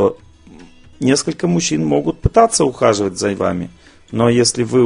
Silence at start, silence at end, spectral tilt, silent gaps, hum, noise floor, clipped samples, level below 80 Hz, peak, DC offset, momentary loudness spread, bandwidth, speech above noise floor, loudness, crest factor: 0 s; 0 s; -5 dB/octave; none; none; -41 dBFS; under 0.1%; -36 dBFS; 0 dBFS; under 0.1%; 7 LU; 10.5 kHz; 26 dB; -16 LUFS; 16 dB